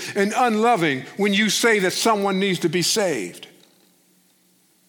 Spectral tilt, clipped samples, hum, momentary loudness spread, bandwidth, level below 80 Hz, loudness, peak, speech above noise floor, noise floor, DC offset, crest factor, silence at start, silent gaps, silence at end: -3.5 dB/octave; under 0.1%; none; 6 LU; 19 kHz; -72 dBFS; -20 LUFS; -6 dBFS; 40 dB; -60 dBFS; under 0.1%; 16 dB; 0 s; none; 1.45 s